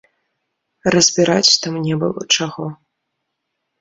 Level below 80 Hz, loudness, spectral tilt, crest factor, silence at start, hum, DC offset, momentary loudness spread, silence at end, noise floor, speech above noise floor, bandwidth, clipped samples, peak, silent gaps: -56 dBFS; -15 LUFS; -3 dB/octave; 18 dB; 0.85 s; none; under 0.1%; 12 LU; 1.05 s; -75 dBFS; 59 dB; 8 kHz; under 0.1%; 0 dBFS; none